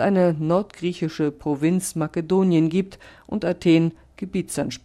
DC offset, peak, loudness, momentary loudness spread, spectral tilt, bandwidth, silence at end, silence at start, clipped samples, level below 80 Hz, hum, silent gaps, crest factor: under 0.1%; -6 dBFS; -22 LUFS; 10 LU; -6.5 dB/octave; 14.5 kHz; 0.1 s; 0 s; under 0.1%; -54 dBFS; none; none; 16 dB